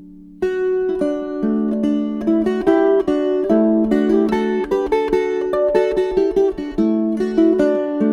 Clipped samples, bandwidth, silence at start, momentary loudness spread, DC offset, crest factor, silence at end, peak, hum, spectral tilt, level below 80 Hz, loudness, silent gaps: under 0.1%; 9.8 kHz; 0 s; 5 LU; under 0.1%; 14 dB; 0 s; -4 dBFS; none; -7.5 dB/octave; -44 dBFS; -18 LUFS; none